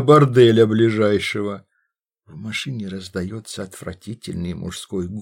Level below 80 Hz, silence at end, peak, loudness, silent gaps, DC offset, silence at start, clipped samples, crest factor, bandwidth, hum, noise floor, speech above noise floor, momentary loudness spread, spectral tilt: -52 dBFS; 0 s; -2 dBFS; -19 LUFS; none; under 0.1%; 0 s; under 0.1%; 18 dB; 16 kHz; none; -73 dBFS; 54 dB; 20 LU; -6.5 dB/octave